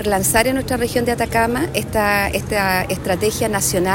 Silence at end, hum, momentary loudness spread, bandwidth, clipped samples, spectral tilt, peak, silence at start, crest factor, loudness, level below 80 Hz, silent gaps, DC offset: 0 s; none; 4 LU; 16.5 kHz; under 0.1%; -4 dB/octave; -2 dBFS; 0 s; 16 dB; -18 LUFS; -36 dBFS; none; under 0.1%